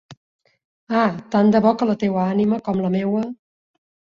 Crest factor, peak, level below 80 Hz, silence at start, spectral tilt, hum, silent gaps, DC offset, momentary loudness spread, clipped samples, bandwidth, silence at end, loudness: 18 dB; -2 dBFS; -60 dBFS; 0.1 s; -8.5 dB/octave; none; 0.17-0.39 s, 0.65-0.87 s; under 0.1%; 8 LU; under 0.1%; 7.2 kHz; 0.8 s; -20 LUFS